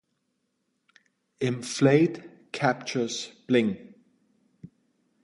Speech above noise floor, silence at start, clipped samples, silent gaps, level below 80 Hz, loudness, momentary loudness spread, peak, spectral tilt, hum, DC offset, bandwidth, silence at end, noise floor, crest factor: 52 dB; 1.4 s; under 0.1%; none; -70 dBFS; -26 LUFS; 15 LU; -6 dBFS; -5.5 dB/octave; none; under 0.1%; 11.5 kHz; 1.4 s; -77 dBFS; 22 dB